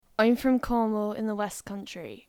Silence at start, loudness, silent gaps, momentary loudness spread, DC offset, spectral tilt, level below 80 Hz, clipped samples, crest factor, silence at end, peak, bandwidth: 0.2 s; -27 LUFS; none; 14 LU; under 0.1%; -5.5 dB/octave; -50 dBFS; under 0.1%; 18 dB; 0.1 s; -10 dBFS; 17.5 kHz